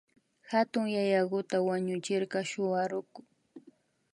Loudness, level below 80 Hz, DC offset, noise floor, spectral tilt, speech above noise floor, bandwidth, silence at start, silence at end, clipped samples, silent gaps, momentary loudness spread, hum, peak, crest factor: -31 LUFS; -82 dBFS; under 0.1%; -63 dBFS; -5.5 dB/octave; 32 dB; 11.5 kHz; 0.5 s; 0.55 s; under 0.1%; none; 5 LU; none; -14 dBFS; 18 dB